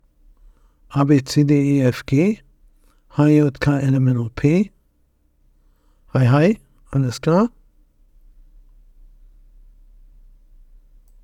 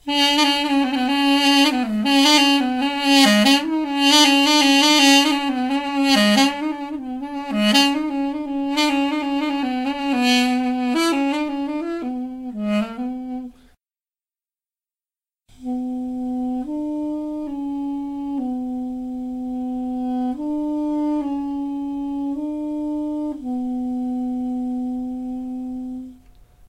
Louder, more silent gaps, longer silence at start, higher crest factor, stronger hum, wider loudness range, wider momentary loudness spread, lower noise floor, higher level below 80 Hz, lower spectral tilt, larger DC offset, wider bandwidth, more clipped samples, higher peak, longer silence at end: about the same, -18 LUFS vs -19 LUFS; neither; first, 0.9 s vs 0.05 s; about the same, 18 dB vs 20 dB; neither; second, 7 LU vs 14 LU; second, 10 LU vs 15 LU; second, -61 dBFS vs under -90 dBFS; first, -46 dBFS vs -52 dBFS; first, -8 dB/octave vs -2.5 dB/octave; neither; second, 12.5 kHz vs 16 kHz; neither; about the same, -2 dBFS vs -2 dBFS; first, 3.75 s vs 0.55 s